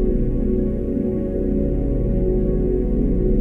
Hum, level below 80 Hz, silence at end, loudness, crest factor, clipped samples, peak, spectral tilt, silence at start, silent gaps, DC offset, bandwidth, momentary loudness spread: none; -22 dBFS; 0 s; -21 LUFS; 12 dB; under 0.1%; -8 dBFS; -12.5 dB/octave; 0 s; none; under 0.1%; 2.7 kHz; 2 LU